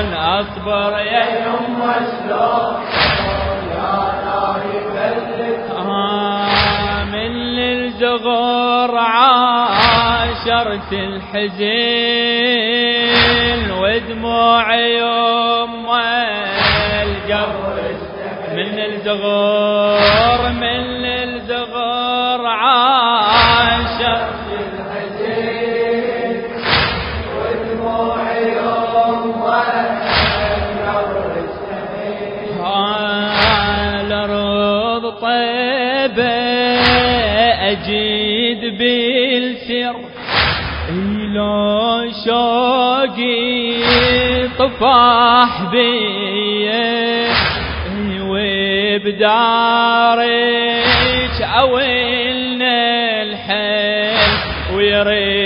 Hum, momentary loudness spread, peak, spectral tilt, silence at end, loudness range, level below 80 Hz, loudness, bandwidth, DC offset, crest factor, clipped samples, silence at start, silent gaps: none; 9 LU; 0 dBFS; -7.5 dB/octave; 0 s; 5 LU; -34 dBFS; -15 LUFS; 5.4 kHz; under 0.1%; 16 dB; under 0.1%; 0 s; none